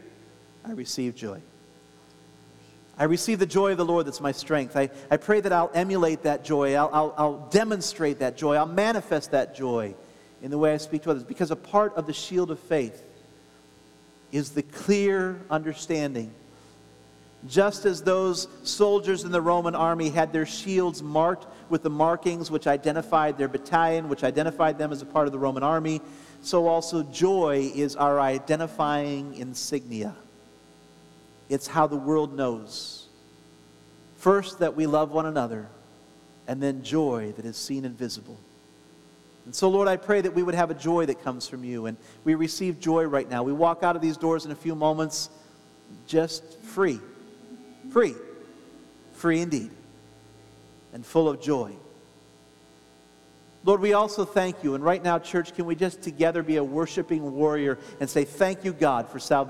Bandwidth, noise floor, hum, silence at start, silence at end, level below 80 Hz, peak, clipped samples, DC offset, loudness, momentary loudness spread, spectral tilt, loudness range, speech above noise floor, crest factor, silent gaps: 15 kHz; -55 dBFS; none; 0.05 s; 0 s; -68 dBFS; -6 dBFS; under 0.1%; under 0.1%; -26 LUFS; 11 LU; -5 dB/octave; 5 LU; 30 dB; 22 dB; none